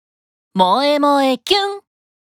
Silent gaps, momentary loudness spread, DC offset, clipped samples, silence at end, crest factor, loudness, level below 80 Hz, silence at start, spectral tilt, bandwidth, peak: none; 11 LU; under 0.1%; under 0.1%; 0.5 s; 16 dB; -15 LUFS; -60 dBFS; 0.55 s; -4.5 dB/octave; 17.5 kHz; -2 dBFS